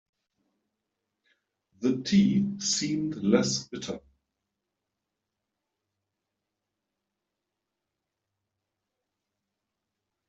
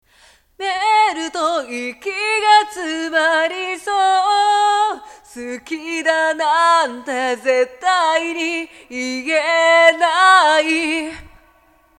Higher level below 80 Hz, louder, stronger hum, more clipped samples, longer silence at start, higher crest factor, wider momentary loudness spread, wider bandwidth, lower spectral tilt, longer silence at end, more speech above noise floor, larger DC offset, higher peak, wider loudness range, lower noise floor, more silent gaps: second, -68 dBFS vs -58 dBFS; second, -26 LUFS vs -16 LUFS; neither; neither; first, 1.8 s vs 0.6 s; first, 24 dB vs 18 dB; about the same, 14 LU vs 14 LU; second, 8.2 kHz vs 14 kHz; first, -4.5 dB/octave vs -0.5 dB/octave; first, 6.3 s vs 0.7 s; first, 59 dB vs 38 dB; neither; second, -8 dBFS vs 0 dBFS; first, 11 LU vs 3 LU; first, -85 dBFS vs -54 dBFS; neither